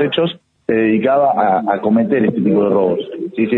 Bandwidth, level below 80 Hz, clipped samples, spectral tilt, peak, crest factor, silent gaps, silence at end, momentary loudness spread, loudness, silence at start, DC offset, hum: 4.2 kHz; -58 dBFS; under 0.1%; -9 dB/octave; -2 dBFS; 12 dB; none; 0 s; 7 LU; -15 LUFS; 0 s; under 0.1%; none